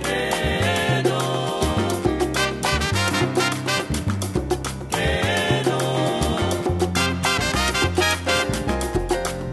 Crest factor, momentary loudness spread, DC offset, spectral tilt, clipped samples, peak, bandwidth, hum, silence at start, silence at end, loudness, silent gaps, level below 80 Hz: 16 dB; 4 LU; under 0.1%; -4 dB/octave; under 0.1%; -6 dBFS; 13 kHz; none; 0 s; 0 s; -21 LUFS; none; -34 dBFS